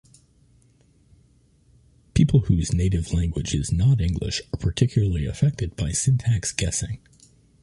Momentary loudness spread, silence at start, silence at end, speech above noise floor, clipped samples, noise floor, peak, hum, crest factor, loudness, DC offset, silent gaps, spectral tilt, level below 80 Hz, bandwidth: 8 LU; 2.15 s; 0.65 s; 37 dB; under 0.1%; -58 dBFS; -6 dBFS; none; 18 dB; -23 LUFS; under 0.1%; none; -5.5 dB/octave; -34 dBFS; 11.5 kHz